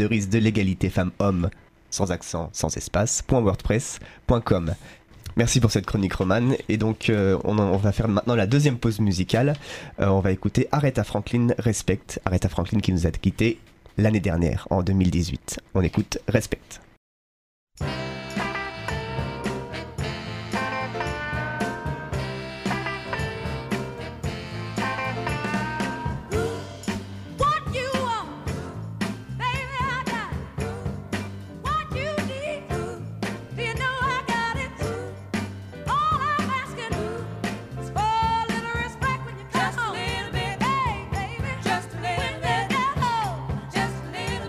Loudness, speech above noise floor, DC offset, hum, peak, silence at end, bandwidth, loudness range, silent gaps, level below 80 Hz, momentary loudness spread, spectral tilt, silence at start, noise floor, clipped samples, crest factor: -26 LUFS; over 68 dB; under 0.1%; none; -4 dBFS; 0 s; 15.5 kHz; 7 LU; 16.97-17.67 s; -40 dBFS; 10 LU; -5.5 dB/octave; 0 s; under -90 dBFS; under 0.1%; 20 dB